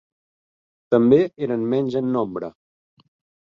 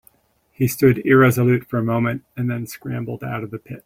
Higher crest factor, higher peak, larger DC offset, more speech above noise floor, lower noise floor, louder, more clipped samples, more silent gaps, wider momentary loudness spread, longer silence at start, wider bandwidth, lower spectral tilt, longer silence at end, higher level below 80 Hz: about the same, 18 dB vs 18 dB; about the same, -4 dBFS vs -2 dBFS; neither; first, over 71 dB vs 38 dB; first, under -90 dBFS vs -57 dBFS; about the same, -20 LUFS vs -19 LUFS; neither; neither; about the same, 13 LU vs 14 LU; first, 0.9 s vs 0.6 s; second, 6.8 kHz vs 16.5 kHz; first, -9 dB/octave vs -7 dB/octave; first, 0.95 s vs 0.05 s; second, -62 dBFS vs -52 dBFS